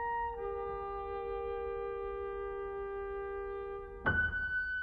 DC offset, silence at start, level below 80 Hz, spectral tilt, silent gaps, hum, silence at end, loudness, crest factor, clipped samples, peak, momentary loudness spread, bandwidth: under 0.1%; 0 s; -52 dBFS; -8 dB/octave; none; none; 0 s; -38 LUFS; 18 dB; under 0.1%; -20 dBFS; 8 LU; 4.8 kHz